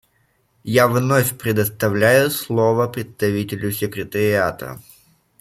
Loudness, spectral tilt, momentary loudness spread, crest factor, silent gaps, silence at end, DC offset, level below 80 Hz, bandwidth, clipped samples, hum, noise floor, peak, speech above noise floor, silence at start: -19 LUFS; -5.5 dB/octave; 10 LU; 18 dB; none; 0.6 s; under 0.1%; -54 dBFS; 16.5 kHz; under 0.1%; none; -63 dBFS; -2 dBFS; 45 dB; 0.65 s